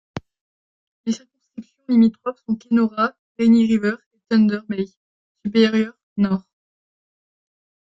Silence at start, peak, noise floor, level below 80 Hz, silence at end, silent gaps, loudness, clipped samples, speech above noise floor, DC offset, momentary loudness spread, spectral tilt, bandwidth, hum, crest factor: 0.15 s; -4 dBFS; -40 dBFS; -62 dBFS; 1.45 s; 0.41-1.04 s, 3.19-3.35 s, 4.06-4.11 s, 4.97-5.35 s, 6.03-6.16 s; -20 LUFS; under 0.1%; 22 dB; under 0.1%; 19 LU; -7 dB/octave; 7.6 kHz; none; 18 dB